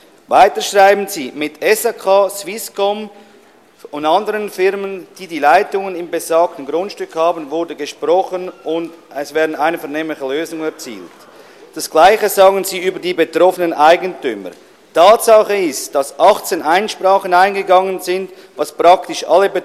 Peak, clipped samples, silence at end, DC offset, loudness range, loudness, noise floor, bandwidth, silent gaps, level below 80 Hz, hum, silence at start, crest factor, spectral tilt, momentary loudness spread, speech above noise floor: 0 dBFS; under 0.1%; 0 s; under 0.1%; 7 LU; -14 LUFS; -46 dBFS; 15.5 kHz; none; -56 dBFS; none; 0.3 s; 14 dB; -3 dB/octave; 14 LU; 32 dB